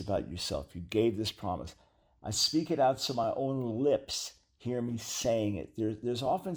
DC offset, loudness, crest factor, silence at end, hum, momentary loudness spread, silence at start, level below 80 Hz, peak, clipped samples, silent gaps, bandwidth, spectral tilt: under 0.1%; -32 LUFS; 16 dB; 0 s; none; 10 LU; 0 s; -56 dBFS; -16 dBFS; under 0.1%; none; over 20 kHz; -4.5 dB/octave